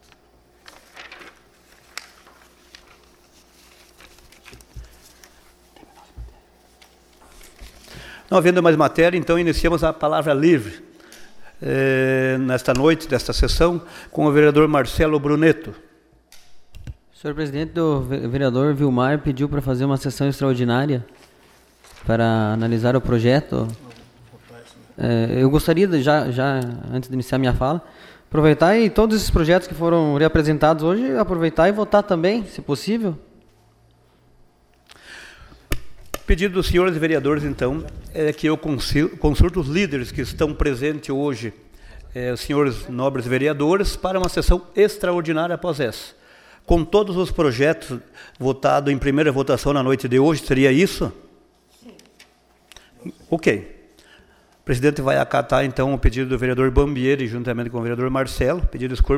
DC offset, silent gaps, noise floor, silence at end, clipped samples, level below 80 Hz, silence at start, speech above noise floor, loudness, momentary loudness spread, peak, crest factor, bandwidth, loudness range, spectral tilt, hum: under 0.1%; none; -56 dBFS; 0 s; under 0.1%; -32 dBFS; 0.95 s; 37 dB; -19 LUFS; 14 LU; -2 dBFS; 18 dB; 16 kHz; 6 LU; -6.5 dB/octave; none